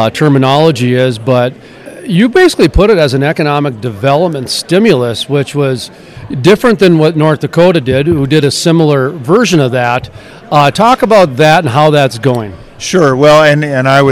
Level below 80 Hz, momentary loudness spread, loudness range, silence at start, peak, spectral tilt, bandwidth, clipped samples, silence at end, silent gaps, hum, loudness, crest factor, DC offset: -30 dBFS; 8 LU; 2 LU; 0 s; 0 dBFS; -6 dB/octave; 15 kHz; 3%; 0 s; none; none; -9 LUFS; 8 dB; under 0.1%